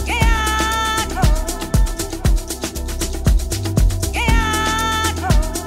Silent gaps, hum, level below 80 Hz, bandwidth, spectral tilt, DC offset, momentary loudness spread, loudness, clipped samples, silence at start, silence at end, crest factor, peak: none; none; -20 dBFS; 16 kHz; -4 dB/octave; under 0.1%; 6 LU; -19 LUFS; under 0.1%; 0 s; 0 s; 14 dB; -2 dBFS